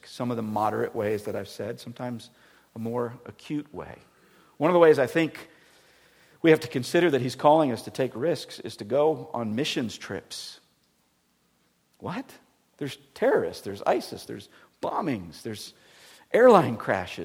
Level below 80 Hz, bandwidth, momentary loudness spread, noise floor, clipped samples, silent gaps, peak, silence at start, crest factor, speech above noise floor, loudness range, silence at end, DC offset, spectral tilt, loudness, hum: -68 dBFS; 16.5 kHz; 20 LU; -69 dBFS; under 0.1%; none; -2 dBFS; 0.05 s; 24 dB; 43 dB; 10 LU; 0 s; under 0.1%; -5.5 dB/octave; -26 LUFS; none